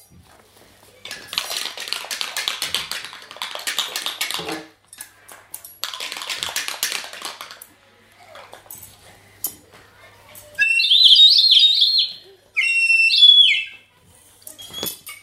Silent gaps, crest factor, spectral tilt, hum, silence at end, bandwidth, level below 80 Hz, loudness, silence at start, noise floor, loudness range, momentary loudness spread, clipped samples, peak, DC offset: none; 20 dB; 1.5 dB/octave; none; 0.05 s; 16 kHz; -66 dBFS; -14 LUFS; 1.05 s; -52 dBFS; 18 LU; 25 LU; under 0.1%; 0 dBFS; under 0.1%